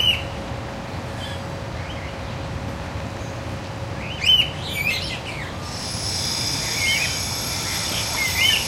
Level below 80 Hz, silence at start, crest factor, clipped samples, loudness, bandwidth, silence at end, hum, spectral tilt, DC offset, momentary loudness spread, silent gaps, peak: -40 dBFS; 0 s; 20 dB; under 0.1%; -23 LUFS; 16 kHz; 0 s; none; -2 dB/octave; under 0.1%; 14 LU; none; -4 dBFS